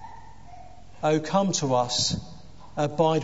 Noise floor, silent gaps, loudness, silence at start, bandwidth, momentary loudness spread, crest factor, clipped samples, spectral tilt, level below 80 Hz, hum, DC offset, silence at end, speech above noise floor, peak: -47 dBFS; none; -25 LUFS; 0 s; 8 kHz; 15 LU; 18 dB; under 0.1%; -4.5 dB/octave; -52 dBFS; none; 0.7%; 0 s; 23 dB; -8 dBFS